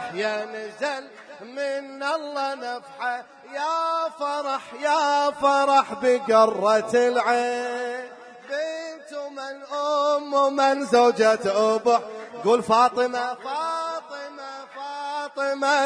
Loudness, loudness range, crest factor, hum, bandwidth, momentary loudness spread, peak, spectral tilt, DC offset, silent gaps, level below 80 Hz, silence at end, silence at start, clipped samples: -23 LUFS; 8 LU; 18 dB; none; 10.5 kHz; 16 LU; -6 dBFS; -3.5 dB/octave; under 0.1%; none; -72 dBFS; 0 s; 0 s; under 0.1%